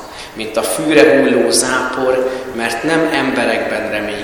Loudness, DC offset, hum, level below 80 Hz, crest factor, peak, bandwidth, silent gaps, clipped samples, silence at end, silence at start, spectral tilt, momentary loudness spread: -14 LUFS; under 0.1%; none; -46 dBFS; 14 dB; 0 dBFS; 19.5 kHz; none; 0.2%; 0 s; 0 s; -3 dB/octave; 10 LU